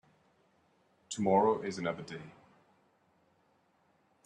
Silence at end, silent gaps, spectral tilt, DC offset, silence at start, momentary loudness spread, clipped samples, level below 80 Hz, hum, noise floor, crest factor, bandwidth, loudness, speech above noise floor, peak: 1.95 s; none; -5.5 dB/octave; under 0.1%; 1.1 s; 18 LU; under 0.1%; -78 dBFS; none; -72 dBFS; 22 dB; 11 kHz; -32 LUFS; 40 dB; -16 dBFS